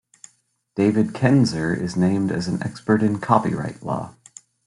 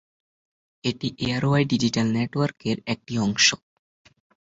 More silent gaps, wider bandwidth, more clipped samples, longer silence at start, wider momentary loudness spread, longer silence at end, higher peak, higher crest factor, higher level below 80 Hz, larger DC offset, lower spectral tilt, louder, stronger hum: neither; first, 11.5 kHz vs 8 kHz; neither; about the same, 0.75 s vs 0.85 s; about the same, 10 LU vs 10 LU; second, 0.55 s vs 0.95 s; first, -2 dBFS vs -6 dBFS; about the same, 20 dB vs 20 dB; about the same, -56 dBFS vs -56 dBFS; neither; first, -7 dB/octave vs -4 dB/octave; about the same, -21 LUFS vs -23 LUFS; neither